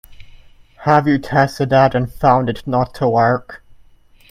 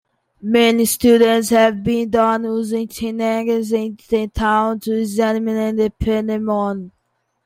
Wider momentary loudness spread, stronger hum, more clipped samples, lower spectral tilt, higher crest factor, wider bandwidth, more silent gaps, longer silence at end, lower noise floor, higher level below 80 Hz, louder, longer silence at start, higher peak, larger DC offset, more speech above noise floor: about the same, 6 LU vs 8 LU; neither; neither; first, -7.5 dB/octave vs -4.5 dB/octave; about the same, 16 dB vs 16 dB; about the same, 15.5 kHz vs 16 kHz; neither; first, 0.75 s vs 0.55 s; second, -47 dBFS vs -69 dBFS; about the same, -42 dBFS vs -40 dBFS; about the same, -16 LUFS vs -17 LUFS; second, 0.1 s vs 0.45 s; about the same, 0 dBFS vs -2 dBFS; neither; second, 32 dB vs 52 dB